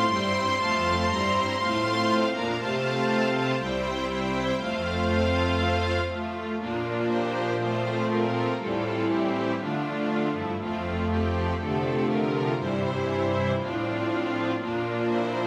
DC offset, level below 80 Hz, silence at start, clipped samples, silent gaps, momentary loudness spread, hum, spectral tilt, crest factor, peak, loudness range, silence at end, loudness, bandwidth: under 0.1%; -46 dBFS; 0 s; under 0.1%; none; 5 LU; none; -6 dB/octave; 14 dB; -12 dBFS; 2 LU; 0 s; -26 LUFS; 12 kHz